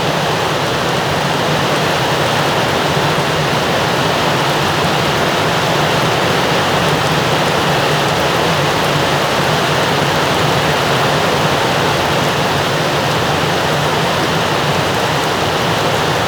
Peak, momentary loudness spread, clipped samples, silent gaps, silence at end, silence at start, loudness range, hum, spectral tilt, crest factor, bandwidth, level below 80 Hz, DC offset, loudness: -2 dBFS; 1 LU; under 0.1%; none; 0 s; 0 s; 1 LU; none; -4 dB/octave; 12 dB; over 20 kHz; -40 dBFS; under 0.1%; -14 LUFS